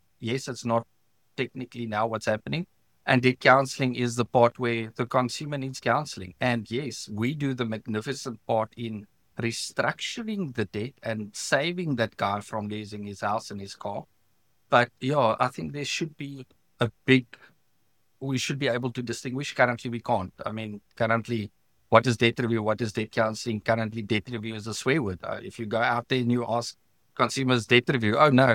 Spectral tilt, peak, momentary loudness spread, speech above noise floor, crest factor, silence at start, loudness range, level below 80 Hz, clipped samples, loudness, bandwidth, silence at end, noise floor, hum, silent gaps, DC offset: -5 dB/octave; -2 dBFS; 14 LU; 47 dB; 26 dB; 0.2 s; 6 LU; -64 dBFS; under 0.1%; -27 LUFS; 16.5 kHz; 0 s; -73 dBFS; none; none; under 0.1%